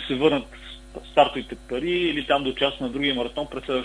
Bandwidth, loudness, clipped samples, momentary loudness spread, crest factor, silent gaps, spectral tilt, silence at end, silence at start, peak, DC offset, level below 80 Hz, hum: 11 kHz; -24 LUFS; under 0.1%; 16 LU; 20 dB; none; -5.5 dB/octave; 0 s; 0 s; -4 dBFS; under 0.1%; -46 dBFS; none